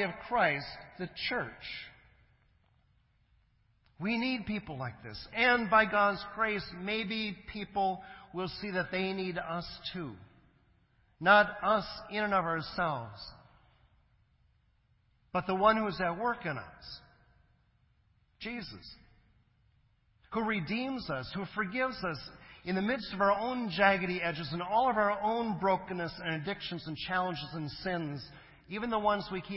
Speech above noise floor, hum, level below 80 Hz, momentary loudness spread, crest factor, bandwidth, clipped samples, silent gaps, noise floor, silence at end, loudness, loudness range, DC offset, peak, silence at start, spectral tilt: 38 dB; none; -60 dBFS; 16 LU; 24 dB; 5.8 kHz; under 0.1%; none; -70 dBFS; 0 s; -32 LUFS; 10 LU; under 0.1%; -10 dBFS; 0 s; -9 dB/octave